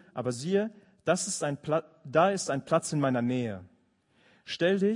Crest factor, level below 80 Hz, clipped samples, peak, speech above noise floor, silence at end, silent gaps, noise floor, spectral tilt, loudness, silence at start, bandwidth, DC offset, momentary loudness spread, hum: 20 dB; -74 dBFS; under 0.1%; -10 dBFS; 39 dB; 0 s; none; -68 dBFS; -5 dB/octave; -29 LUFS; 0.15 s; 11 kHz; under 0.1%; 11 LU; none